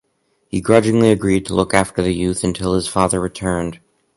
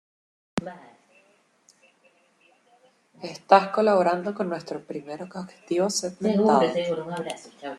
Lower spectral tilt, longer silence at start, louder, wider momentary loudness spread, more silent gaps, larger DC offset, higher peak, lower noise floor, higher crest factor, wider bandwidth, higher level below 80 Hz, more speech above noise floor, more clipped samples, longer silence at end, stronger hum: about the same, -5.5 dB/octave vs -5 dB/octave; about the same, 0.55 s vs 0.55 s; first, -17 LUFS vs -24 LUFS; second, 8 LU vs 18 LU; neither; neither; about the same, 0 dBFS vs -2 dBFS; about the same, -65 dBFS vs -63 dBFS; second, 18 dB vs 24 dB; second, 11.5 kHz vs 13 kHz; first, -38 dBFS vs -68 dBFS; first, 48 dB vs 38 dB; neither; first, 0.4 s vs 0 s; neither